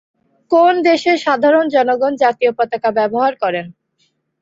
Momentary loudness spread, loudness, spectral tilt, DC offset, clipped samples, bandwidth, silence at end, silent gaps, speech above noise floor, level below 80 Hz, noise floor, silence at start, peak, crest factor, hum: 7 LU; -15 LUFS; -5 dB/octave; under 0.1%; under 0.1%; 7.8 kHz; 0.7 s; none; 50 dB; -64 dBFS; -64 dBFS; 0.5 s; -2 dBFS; 14 dB; none